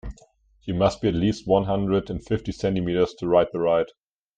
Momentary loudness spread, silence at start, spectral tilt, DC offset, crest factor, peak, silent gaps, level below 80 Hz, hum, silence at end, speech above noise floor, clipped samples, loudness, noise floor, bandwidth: 8 LU; 0.05 s; -7.5 dB/octave; under 0.1%; 18 dB; -4 dBFS; none; -44 dBFS; none; 0.5 s; 35 dB; under 0.1%; -24 LUFS; -57 dBFS; 9 kHz